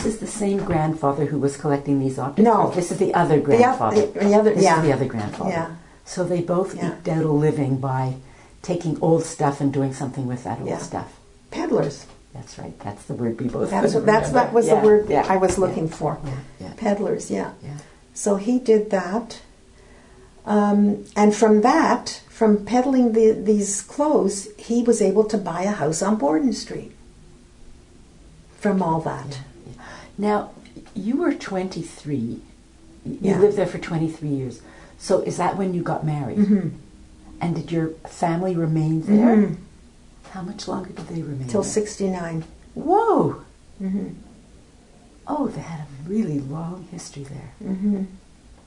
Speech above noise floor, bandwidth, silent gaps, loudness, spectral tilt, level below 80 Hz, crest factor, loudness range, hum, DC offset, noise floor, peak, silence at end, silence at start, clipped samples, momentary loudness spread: 29 dB; 11 kHz; none; -21 LUFS; -6.5 dB/octave; -50 dBFS; 20 dB; 9 LU; none; under 0.1%; -49 dBFS; -2 dBFS; 0.5 s; 0 s; under 0.1%; 18 LU